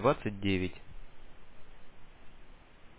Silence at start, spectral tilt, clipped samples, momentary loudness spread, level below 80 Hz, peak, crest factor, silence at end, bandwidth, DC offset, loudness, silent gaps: 0 s; -5 dB/octave; under 0.1%; 25 LU; -52 dBFS; -14 dBFS; 22 dB; 0 s; 4 kHz; under 0.1%; -33 LUFS; none